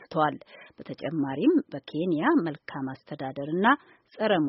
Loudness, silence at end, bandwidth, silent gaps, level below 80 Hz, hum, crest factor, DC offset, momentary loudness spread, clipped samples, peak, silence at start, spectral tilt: -27 LUFS; 0 s; 5.8 kHz; none; -72 dBFS; none; 20 dB; under 0.1%; 13 LU; under 0.1%; -8 dBFS; 0 s; -4.5 dB/octave